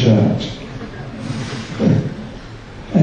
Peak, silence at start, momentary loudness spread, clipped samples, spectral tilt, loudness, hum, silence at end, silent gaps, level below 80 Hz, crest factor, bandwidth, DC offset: -2 dBFS; 0 s; 18 LU; under 0.1%; -7.5 dB/octave; -20 LUFS; none; 0 s; none; -40 dBFS; 16 dB; 9.6 kHz; under 0.1%